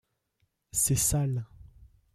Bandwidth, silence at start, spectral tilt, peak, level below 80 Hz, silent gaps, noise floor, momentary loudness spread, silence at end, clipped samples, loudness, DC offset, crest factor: 16 kHz; 0.75 s; -4 dB/octave; -14 dBFS; -48 dBFS; none; -76 dBFS; 12 LU; 0.5 s; under 0.1%; -27 LUFS; under 0.1%; 18 dB